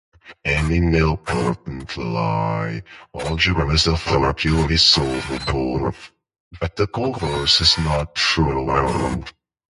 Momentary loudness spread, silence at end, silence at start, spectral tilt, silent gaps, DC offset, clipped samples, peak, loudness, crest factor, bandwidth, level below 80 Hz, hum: 15 LU; 0.4 s; 0.25 s; -4.5 dB/octave; 6.40-6.51 s; under 0.1%; under 0.1%; 0 dBFS; -19 LUFS; 20 dB; 11.5 kHz; -32 dBFS; none